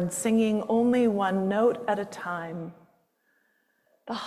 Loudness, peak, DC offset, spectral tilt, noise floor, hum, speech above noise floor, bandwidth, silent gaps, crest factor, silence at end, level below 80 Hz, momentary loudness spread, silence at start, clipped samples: -26 LUFS; -12 dBFS; under 0.1%; -5.5 dB/octave; -70 dBFS; none; 45 dB; 14 kHz; none; 14 dB; 0 s; -68 dBFS; 14 LU; 0 s; under 0.1%